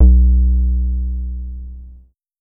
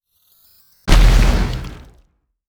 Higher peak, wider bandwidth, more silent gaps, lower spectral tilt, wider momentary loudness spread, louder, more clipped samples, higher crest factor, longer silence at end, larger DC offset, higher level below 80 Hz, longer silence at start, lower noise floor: about the same, 0 dBFS vs 0 dBFS; second, 0.8 kHz vs 14.5 kHz; neither; first, -16.5 dB/octave vs -5 dB/octave; first, 21 LU vs 16 LU; about the same, -17 LUFS vs -17 LUFS; neither; about the same, 14 dB vs 16 dB; second, 0.45 s vs 0.75 s; neither; about the same, -14 dBFS vs -16 dBFS; second, 0 s vs 0.85 s; second, -44 dBFS vs -57 dBFS